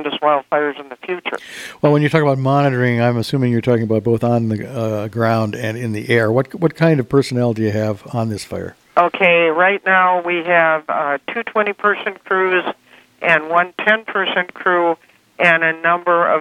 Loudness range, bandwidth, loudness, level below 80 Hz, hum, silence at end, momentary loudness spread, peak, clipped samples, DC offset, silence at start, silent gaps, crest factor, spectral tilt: 3 LU; 15 kHz; -16 LUFS; -58 dBFS; none; 0 s; 10 LU; 0 dBFS; under 0.1%; under 0.1%; 0 s; none; 16 dB; -6.5 dB/octave